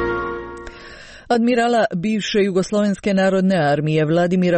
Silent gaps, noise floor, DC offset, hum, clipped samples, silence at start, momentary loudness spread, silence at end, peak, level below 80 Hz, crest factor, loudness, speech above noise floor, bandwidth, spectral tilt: none; -39 dBFS; under 0.1%; none; under 0.1%; 0 s; 17 LU; 0 s; -6 dBFS; -46 dBFS; 12 dB; -18 LUFS; 22 dB; 8.8 kHz; -6.5 dB/octave